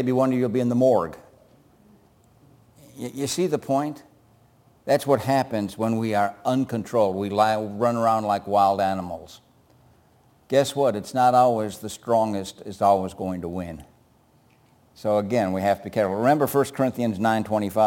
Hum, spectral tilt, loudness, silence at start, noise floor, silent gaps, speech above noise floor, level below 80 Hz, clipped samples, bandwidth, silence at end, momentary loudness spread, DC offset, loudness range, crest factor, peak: none; -6 dB/octave; -23 LUFS; 0 s; -59 dBFS; none; 36 dB; -60 dBFS; under 0.1%; 17 kHz; 0 s; 12 LU; under 0.1%; 5 LU; 18 dB; -6 dBFS